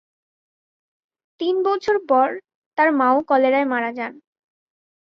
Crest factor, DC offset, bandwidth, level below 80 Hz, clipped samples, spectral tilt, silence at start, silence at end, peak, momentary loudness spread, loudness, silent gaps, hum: 18 dB; under 0.1%; 7 kHz; -68 dBFS; under 0.1%; -5 dB/octave; 1.4 s; 0.95 s; -4 dBFS; 13 LU; -19 LUFS; 2.55-2.72 s; none